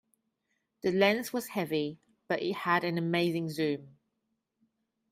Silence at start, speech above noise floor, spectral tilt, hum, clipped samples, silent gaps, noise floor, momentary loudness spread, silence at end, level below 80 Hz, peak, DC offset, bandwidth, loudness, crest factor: 0.85 s; 52 dB; -5.5 dB/octave; none; under 0.1%; none; -82 dBFS; 9 LU; 1.2 s; -74 dBFS; -12 dBFS; under 0.1%; 15.5 kHz; -31 LUFS; 20 dB